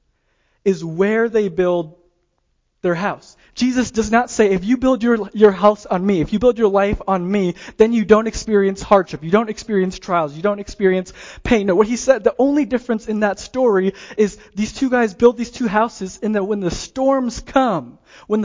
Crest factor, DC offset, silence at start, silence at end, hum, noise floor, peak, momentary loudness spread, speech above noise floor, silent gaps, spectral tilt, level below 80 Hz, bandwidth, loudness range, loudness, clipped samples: 18 dB; under 0.1%; 0.65 s; 0 s; none; -67 dBFS; 0 dBFS; 8 LU; 49 dB; none; -6 dB/octave; -42 dBFS; 7.6 kHz; 4 LU; -18 LUFS; under 0.1%